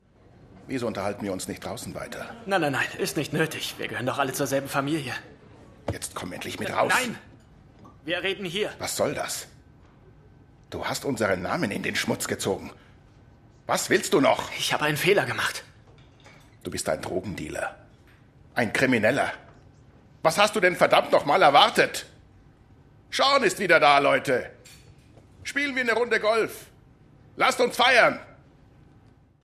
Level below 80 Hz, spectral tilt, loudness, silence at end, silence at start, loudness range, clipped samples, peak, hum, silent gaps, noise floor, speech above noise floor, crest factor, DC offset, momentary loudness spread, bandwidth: -60 dBFS; -3.5 dB/octave; -24 LUFS; 1.1 s; 0.55 s; 8 LU; under 0.1%; -2 dBFS; none; none; -56 dBFS; 32 dB; 24 dB; under 0.1%; 16 LU; 14 kHz